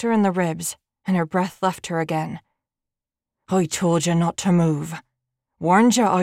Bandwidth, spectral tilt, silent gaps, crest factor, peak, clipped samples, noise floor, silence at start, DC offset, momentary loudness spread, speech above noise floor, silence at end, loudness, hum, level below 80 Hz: 16 kHz; -5.5 dB/octave; none; 16 dB; -6 dBFS; under 0.1%; -88 dBFS; 0 s; under 0.1%; 14 LU; 68 dB; 0 s; -21 LUFS; none; -62 dBFS